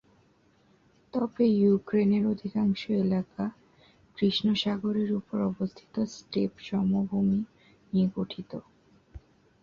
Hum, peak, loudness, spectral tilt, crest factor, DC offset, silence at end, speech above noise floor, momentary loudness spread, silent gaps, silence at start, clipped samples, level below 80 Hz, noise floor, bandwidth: none; -14 dBFS; -28 LUFS; -7.5 dB/octave; 16 dB; under 0.1%; 0.45 s; 37 dB; 11 LU; none; 1.15 s; under 0.1%; -60 dBFS; -64 dBFS; 7 kHz